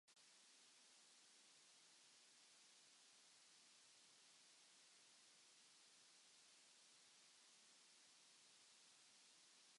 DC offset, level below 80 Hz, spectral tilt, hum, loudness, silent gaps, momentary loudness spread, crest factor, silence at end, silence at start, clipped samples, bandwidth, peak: under 0.1%; under -90 dBFS; 1 dB/octave; none; -69 LUFS; none; 0 LU; 14 dB; 0 s; 0.05 s; under 0.1%; 11.5 kHz; -58 dBFS